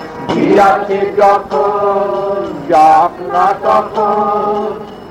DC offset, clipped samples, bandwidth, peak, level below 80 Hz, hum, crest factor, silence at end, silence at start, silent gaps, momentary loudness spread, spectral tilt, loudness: under 0.1%; under 0.1%; 12 kHz; 0 dBFS; -46 dBFS; none; 12 dB; 0 s; 0 s; none; 10 LU; -6 dB/octave; -12 LUFS